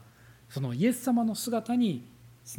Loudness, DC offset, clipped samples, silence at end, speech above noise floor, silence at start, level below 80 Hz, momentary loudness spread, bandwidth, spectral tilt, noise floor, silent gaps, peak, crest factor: -29 LUFS; under 0.1%; under 0.1%; 0 s; 27 dB; 0 s; -68 dBFS; 10 LU; 18 kHz; -5.5 dB/octave; -55 dBFS; none; -14 dBFS; 16 dB